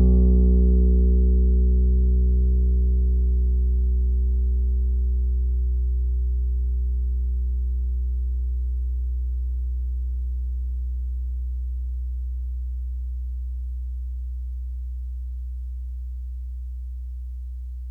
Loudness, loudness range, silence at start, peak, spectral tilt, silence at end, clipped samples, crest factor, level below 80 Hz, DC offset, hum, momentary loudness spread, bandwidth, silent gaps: -25 LUFS; 12 LU; 0 s; -8 dBFS; -13 dB/octave; 0 s; under 0.1%; 14 dB; -22 dBFS; under 0.1%; none; 14 LU; 0.9 kHz; none